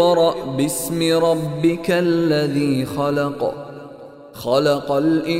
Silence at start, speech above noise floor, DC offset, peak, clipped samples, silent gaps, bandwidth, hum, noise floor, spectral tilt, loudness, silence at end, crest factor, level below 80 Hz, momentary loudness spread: 0 s; 20 dB; under 0.1%; -4 dBFS; under 0.1%; none; 16 kHz; none; -39 dBFS; -5.5 dB/octave; -19 LUFS; 0 s; 14 dB; -52 dBFS; 16 LU